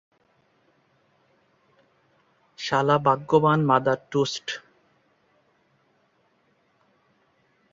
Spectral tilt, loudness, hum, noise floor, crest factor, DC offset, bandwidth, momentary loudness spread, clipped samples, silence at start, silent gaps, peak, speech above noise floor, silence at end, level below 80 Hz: -6 dB/octave; -23 LUFS; none; -66 dBFS; 22 dB; under 0.1%; 7.8 kHz; 14 LU; under 0.1%; 2.6 s; none; -6 dBFS; 45 dB; 3.15 s; -68 dBFS